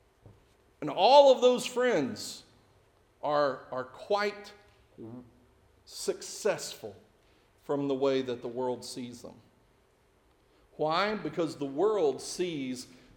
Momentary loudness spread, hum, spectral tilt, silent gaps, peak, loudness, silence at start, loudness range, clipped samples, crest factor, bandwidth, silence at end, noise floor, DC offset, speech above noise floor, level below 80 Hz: 23 LU; none; -4 dB/octave; none; -8 dBFS; -29 LUFS; 0.25 s; 10 LU; under 0.1%; 24 dB; 17.5 kHz; 0.3 s; -66 dBFS; under 0.1%; 37 dB; -70 dBFS